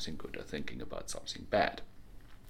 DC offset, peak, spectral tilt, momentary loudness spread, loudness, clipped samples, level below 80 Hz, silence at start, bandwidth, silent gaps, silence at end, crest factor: under 0.1%; -14 dBFS; -3.5 dB/octave; 12 LU; -37 LUFS; under 0.1%; -52 dBFS; 0 s; 16.5 kHz; none; 0 s; 24 dB